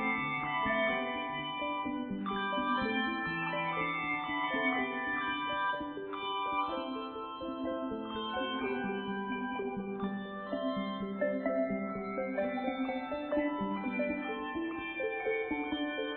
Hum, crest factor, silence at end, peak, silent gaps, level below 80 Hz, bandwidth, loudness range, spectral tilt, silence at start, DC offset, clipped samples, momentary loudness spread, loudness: none; 16 dB; 0 s; -20 dBFS; none; -64 dBFS; 4.6 kHz; 4 LU; -3 dB/octave; 0 s; under 0.1%; under 0.1%; 6 LU; -35 LUFS